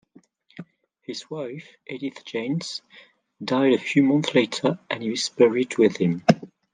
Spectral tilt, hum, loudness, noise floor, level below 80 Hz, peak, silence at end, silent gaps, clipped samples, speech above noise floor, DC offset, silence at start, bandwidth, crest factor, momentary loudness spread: -5.5 dB/octave; none; -23 LUFS; -56 dBFS; -68 dBFS; -2 dBFS; 0.3 s; none; under 0.1%; 34 dB; under 0.1%; 0.55 s; 9.6 kHz; 22 dB; 17 LU